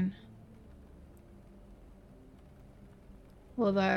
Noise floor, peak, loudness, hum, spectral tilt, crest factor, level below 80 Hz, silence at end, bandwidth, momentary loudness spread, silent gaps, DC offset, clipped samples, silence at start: -55 dBFS; -16 dBFS; -33 LUFS; none; -7.5 dB/octave; 20 dB; -58 dBFS; 0 s; 6.4 kHz; 24 LU; none; under 0.1%; under 0.1%; 0 s